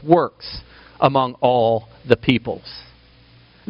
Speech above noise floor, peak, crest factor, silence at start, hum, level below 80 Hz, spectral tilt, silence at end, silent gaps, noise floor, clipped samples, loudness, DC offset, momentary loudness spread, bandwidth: 31 dB; 0 dBFS; 20 dB; 0.05 s; none; -48 dBFS; -4.5 dB/octave; 0.9 s; none; -50 dBFS; under 0.1%; -19 LUFS; under 0.1%; 17 LU; 5.6 kHz